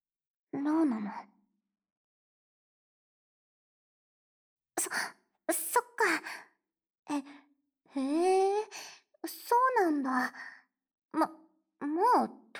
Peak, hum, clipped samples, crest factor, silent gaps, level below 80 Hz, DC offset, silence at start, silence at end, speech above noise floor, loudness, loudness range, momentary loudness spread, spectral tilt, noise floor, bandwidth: -16 dBFS; none; under 0.1%; 18 dB; 1.92-4.57 s, 6.99-7.03 s; -90 dBFS; under 0.1%; 0.55 s; 0 s; 50 dB; -31 LUFS; 10 LU; 17 LU; -3 dB/octave; -80 dBFS; over 20 kHz